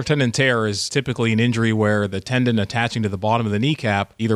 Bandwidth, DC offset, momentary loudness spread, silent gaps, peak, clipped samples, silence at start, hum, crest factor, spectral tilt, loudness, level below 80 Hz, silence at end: 12 kHz; under 0.1%; 4 LU; none; -6 dBFS; under 0.1%; 0 s; none; 14 dB; -5.5 dB/octave; -20 LUFS; -52 dBFS; 0 s